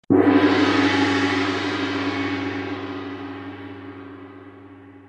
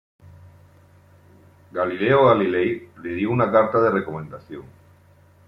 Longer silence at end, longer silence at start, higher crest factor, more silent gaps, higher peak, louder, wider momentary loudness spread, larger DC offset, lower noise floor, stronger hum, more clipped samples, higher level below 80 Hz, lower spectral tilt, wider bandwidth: second, 0.1 s vs 0.85 s; second, 0.1 s vs 1.75 s; about the same, 18 dB vs 20 dB; neither; about the same, -4 dBFS vs -4 dBFS; about the same, -21 LUFS vs -20 LUFS; about the same, 21 LU vs 20 LU; neither; second, -44 dBFS vs -53 dBFS; neither; neither; about the same, -64 dBFS vs -60 dBFS; second, -5.5 dB/octave vs -9 dB/octave; first, 9 kHz vs 5.8 kHz